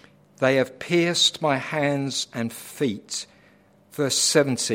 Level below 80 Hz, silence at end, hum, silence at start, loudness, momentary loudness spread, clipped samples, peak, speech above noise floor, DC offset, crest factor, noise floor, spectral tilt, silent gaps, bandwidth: -68 dBFS; 0 s; none; 0.4 s; -23 LUFS; 13 LU; under 0.1%; -4 dBFS; 33 dB; under 0.1%; 20 dB; -56 dBFS; -3 dB/octave; none; 16.5 kHz